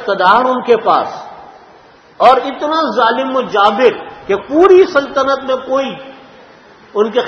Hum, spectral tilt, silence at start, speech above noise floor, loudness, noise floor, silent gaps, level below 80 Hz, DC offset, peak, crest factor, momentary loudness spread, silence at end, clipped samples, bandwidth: none; -5 dB/octave; 0 s; 31 dB; -12 LUFS; -42 dBFS; none; -52 dBFS; under 0.1%; 0 dBFS; 14 dB; 14 LU; 0 s; 0.3%; 6.8 kHz